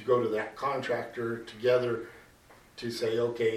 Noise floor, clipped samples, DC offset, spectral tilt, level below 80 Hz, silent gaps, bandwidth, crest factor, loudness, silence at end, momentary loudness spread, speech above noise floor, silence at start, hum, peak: -57 dBFS; under 0.1%; under 0.1%; -5.5 dB/octave; -66 dBFS; none; 14 kHz; 18 dB; -31 LUFS; 0 s; 11 LU; 28 dB; 0 s; none; -12 dBFS